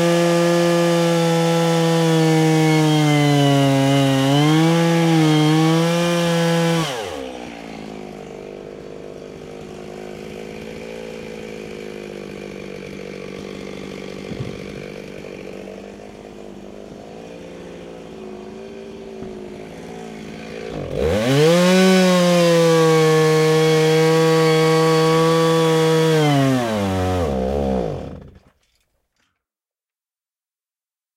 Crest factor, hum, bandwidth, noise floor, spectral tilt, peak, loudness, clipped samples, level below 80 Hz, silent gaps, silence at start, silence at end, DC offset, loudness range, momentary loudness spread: 14 dB; none; 16 kHz; under -90 dBFS; -5.5 dB/octave; -4 dBFS; -16 LUFS; under 0.1%; -44 dBFS; none; 0 s; 2.85 s; under 0.1%; 20 LU; 21 LU